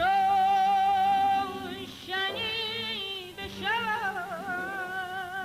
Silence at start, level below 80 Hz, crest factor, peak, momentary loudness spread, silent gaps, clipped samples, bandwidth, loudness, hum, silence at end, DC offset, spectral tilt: 0 s; -62 dBFS; 10 dB; -18 dBFS; 11 LU; none; under 0.1%; 15.5 kHz; -28 LUFS; none; 0 s; under 0.1%; -3 dB/octave